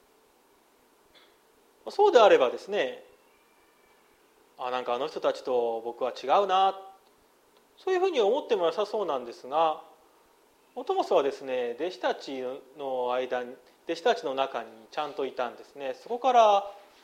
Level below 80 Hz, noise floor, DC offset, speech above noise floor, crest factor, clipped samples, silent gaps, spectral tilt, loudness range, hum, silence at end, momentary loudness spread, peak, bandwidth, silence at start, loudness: -80 dBFS; -63 dBFS; under 0.1%; 36 dB; 24 dB; under 0.1%; none; -3.5 dB/octave; 5 LU; none; 0.25 s; 17 LU; -6 dBFS; 13.5 kHz; 1.85 s; -27 LUFS